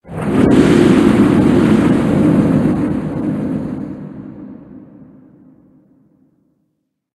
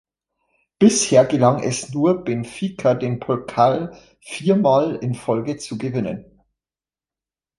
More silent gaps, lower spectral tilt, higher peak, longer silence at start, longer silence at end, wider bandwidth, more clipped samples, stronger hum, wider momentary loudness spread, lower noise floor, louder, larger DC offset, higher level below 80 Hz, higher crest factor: neither; first, -7.5 dB/octave vs -5.5 dB/octave; about the same, 0 dBFS vs -2 dBFS; second, 0.05 s vs 0.8 s; first, 2.35 s vs 1.35 s; about the same, 12.5 kHz vs 11.5 kHz; neither; neither; first, 21 LU vs 12 LU; second, -69 dBFS vs under -90 dBFS; first, -13 LUFS vs -19 LUFS; neither; first, -38 dBFS vs -58 dBFS; about the same, 14 dB vs 18 dB